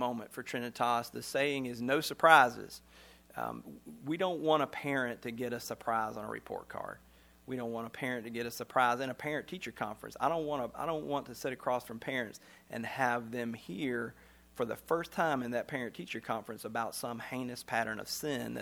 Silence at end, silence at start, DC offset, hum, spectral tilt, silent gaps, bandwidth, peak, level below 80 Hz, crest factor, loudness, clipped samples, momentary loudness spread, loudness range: 0 s; 0 s; under 0.1%; none; -4.5 dB/octave; none; over 20 kHz; -8 dBFS; -68 dBFS; 28 dB; -34 LUFS; under 0.1%; 13 LU; 7 LU